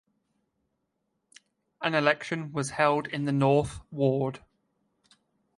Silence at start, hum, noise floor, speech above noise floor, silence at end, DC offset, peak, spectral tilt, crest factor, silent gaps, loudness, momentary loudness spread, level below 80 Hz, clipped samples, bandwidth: 1.8 s; none; -79 dBFS; 52 dB; 1.2 s; under 0.1%; -8 dBFS; -6 dB/octave; 22 dB; none; -27 LUFS; 9 LU; -58 dBFS; under 0.1%; 11.5 kHz